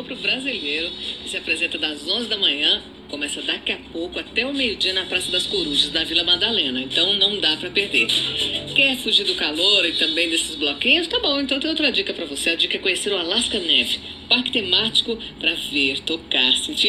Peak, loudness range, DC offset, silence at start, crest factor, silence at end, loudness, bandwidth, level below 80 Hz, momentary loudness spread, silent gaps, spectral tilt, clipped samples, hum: -2 dBFS; 4 LU; under 0.1%; 0 s; 20 dB; 0 s; -19 LUFS; 15 kHz; -50 dBFS; 8 LU; none; -1.5 dB/octave; under 0.1%; none